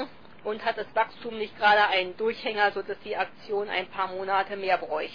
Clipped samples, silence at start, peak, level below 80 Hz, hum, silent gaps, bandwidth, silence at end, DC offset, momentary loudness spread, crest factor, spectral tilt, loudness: under 0.1%; 0 s; -10 dBFS; -64 dBFS; none; none; 5.2 kHz; 0 s; 0.4%; 13 LU; 18 dB; -5 dB/octave; -27 LUFS